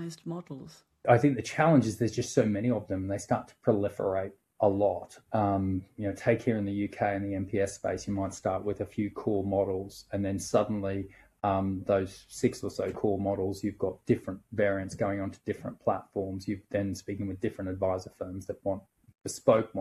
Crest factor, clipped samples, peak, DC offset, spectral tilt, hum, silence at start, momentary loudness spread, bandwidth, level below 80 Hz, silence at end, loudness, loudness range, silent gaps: 22 dB; under 0.1%; -8 dBFS; under 0.1%; -6.5 dB/octave; none; 0 s; 11 LU; 13.5 kHz; -62 dBFS; 0 s; -31 LUFS; 6 LU; none